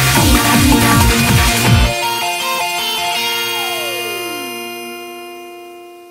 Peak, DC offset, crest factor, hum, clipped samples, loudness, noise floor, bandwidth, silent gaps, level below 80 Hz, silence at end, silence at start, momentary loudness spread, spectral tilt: 0 dBFS; under 0.1%; 14 dB; none; under 0.1%; -13 LUFS; -35 dBFS; 16.5 kHz; none; -24 dBFS; 0 s; 0 s; 19 LU; -3.5 dB/octave